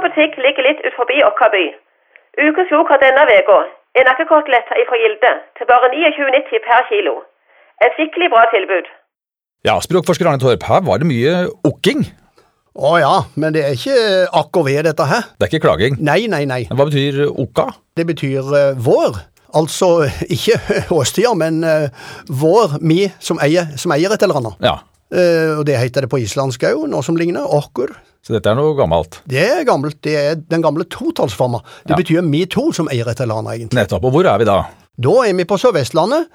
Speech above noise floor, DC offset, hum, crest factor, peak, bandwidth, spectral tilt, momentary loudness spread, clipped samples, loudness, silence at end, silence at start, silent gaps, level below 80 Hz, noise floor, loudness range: 74 dB; under 0.1%; none; 14 dB; 0 dBFS; 16.5 kHz; -5.5 dB/octave; 8 LU; under 0.1%; -14 LUFS; 0.1 s; 0 s; none; -46 dBFS; -88 dBFS; 5 LU